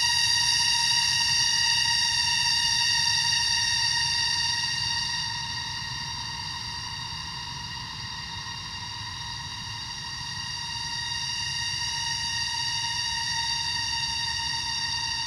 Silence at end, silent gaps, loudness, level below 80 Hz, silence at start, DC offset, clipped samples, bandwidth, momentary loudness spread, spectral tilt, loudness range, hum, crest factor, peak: 0 s; none; -25 LUFS; -50 dBFS; 0 s; under 0.1%; under 0.1%; 16 kHz; 13 LU; 0.5 dB/octave; 12 LU; none; 18 dB; -10 dBFS